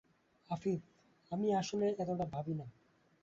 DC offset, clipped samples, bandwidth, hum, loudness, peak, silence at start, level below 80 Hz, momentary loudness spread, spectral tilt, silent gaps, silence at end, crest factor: under 0.1%; under 0.1%; 7.8 kHz; none; -38 LUFS; -24 dBFS; 0.5 s; -70 dBFS; 10 LU; -7 dB/octave; none; 0.55 s; 16 dB